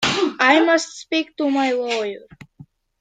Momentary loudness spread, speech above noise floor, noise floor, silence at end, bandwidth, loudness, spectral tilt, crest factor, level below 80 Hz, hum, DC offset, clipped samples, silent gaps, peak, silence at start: 10 LU; 28 dB; -48 dBFS; 0.4 s; 9.4 kHz; -19 LUFS; -3 dB/octave; 18 dB; -60 dBFS; none; under 0.1%; under 0.1%; none; -2 dBFS; 0 s